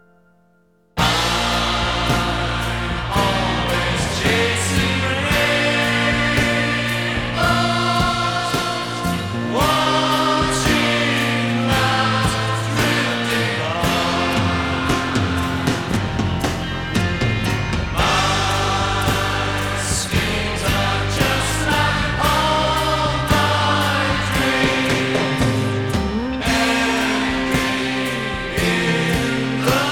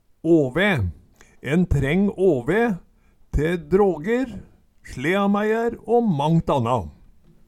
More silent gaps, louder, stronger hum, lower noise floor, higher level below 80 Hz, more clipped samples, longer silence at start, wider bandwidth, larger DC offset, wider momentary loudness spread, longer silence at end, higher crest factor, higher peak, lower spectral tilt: neither; first, -18 LUFS vs -21 LUFS; neither; first, -58 dBFS vs -50 dBFS; first, -32 dBFS vs -38 dBFS; neither; first, 0.95 s vs 0.25 s; first, 20 kHz vs 13.5 kHz; first, 0.4% vs under 0.1%; second, 5 LU vs 11 LU; second, 0 s vs 0.55 s; about the same, 16 dB vs 16 dB; first, -2 dBFS vs -6 dBFS; second, -4.5 dB/octave vs -7.5 dB/octave